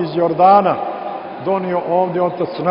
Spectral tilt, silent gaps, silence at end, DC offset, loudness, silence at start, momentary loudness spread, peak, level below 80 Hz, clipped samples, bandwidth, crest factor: -11.5 dB/octave; none; 0 s; under 0.1%; -16 LUFS; 0 s; 14 LU; 0 dBFS; -60 dBFS; under 0.1%; 5.4 kHz; 16 dB